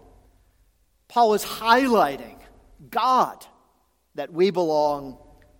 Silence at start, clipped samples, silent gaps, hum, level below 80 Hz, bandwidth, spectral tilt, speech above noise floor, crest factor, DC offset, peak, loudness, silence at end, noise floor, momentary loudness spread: 1.1 s; under 0.1%; none; none; -58 dBFS; 17 kHz; -4.5 dB/octave; 45 dB; 20 dB; under 0.1%; -4 dBFS; -22 LUFS; 0.45 s; -66 dBFS; 18 LU